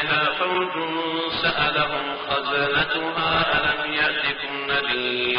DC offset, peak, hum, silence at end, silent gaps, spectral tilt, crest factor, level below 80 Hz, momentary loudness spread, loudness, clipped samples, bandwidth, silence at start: under 0.1%; -8 dBFS; none; 0 s; none; -0.5 dB/octave; 14 dB; -50 dBFS; 5 LU; -22 LUFS; under 0.1%; 5.4 kHz; 0 s